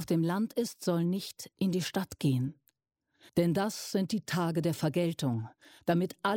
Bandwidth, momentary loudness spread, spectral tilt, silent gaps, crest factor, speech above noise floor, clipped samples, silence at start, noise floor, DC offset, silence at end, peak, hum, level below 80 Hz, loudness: 17 kHz; 6 LU; -6 dB/octave; none; 16 dB; 49 dB; under 0.1%; 0 s; -80 dBFS; under 0.1%; 0 s; -16 dBFS; none; -68 dBFS; -32 LUFS